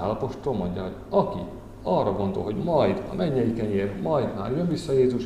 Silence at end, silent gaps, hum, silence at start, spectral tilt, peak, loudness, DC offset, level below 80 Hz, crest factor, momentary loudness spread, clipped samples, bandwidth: 0 s; none; none; 0 s; -8 dB/octave; -8 dBFS; -26 LUFS; 0.1%; -46 dBFS; 16 dB; 7 LU; under 0.1%; 12 kHz